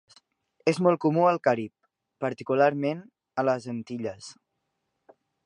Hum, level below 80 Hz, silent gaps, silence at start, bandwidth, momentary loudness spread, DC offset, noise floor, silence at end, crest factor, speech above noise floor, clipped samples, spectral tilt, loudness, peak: none; -74 dBFS; none; 0.65 s; 11 kHz; 14 LU; under 0.1%; -80 dBFS; 1.15 s; 20 dB; 54 dB; under 0.1%; -7 dB/octave; -26 LUFS; -8 dBFS